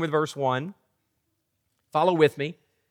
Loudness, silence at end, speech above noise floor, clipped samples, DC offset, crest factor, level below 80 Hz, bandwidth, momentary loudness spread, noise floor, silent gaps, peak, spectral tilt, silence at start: -25 LUFS; 0.4 s; 52 dB; under 0.1%; under 0.1%; 22 dB; -82 dBFS; 16 kHz; 13 LU; -76 dBFS; none; -6 dBFS; -6 dB/octave; 0 s